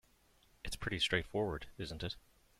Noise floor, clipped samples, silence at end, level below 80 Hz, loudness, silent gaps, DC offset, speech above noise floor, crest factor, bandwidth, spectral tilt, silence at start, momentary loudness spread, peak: -70 dBFS; under 0.1%; 0.4 s; -54 dBFS; -39 LUFS; none; under 0.1%; 31 dB; 24 dB; 16 kHz; -4 dB/octave; 0.65 s; 13 LU; -18 dBFS